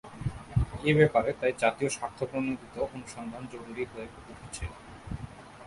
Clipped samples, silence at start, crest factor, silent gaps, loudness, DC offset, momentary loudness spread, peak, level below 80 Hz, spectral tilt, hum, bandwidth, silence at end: under 0.1%; 0.05 s; 24 dB; none; -30 LUFS; under 0.1%; 18 LU; -8 dBFS; -46 dBFS; -6 dB/octave; none; 11.5 kHz; 0 s